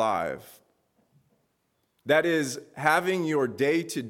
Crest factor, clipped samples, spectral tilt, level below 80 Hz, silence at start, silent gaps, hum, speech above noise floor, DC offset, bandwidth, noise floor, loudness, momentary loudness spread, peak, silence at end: 20 dB; under 0.1%; -4.5 dB/octave; -70 dBFS; 0 s; none; none; 48 dB; under 0.1%; 17 kHz; -74 dBFS; -26 LUFS; 11 LU; -8 dBFS; 0 s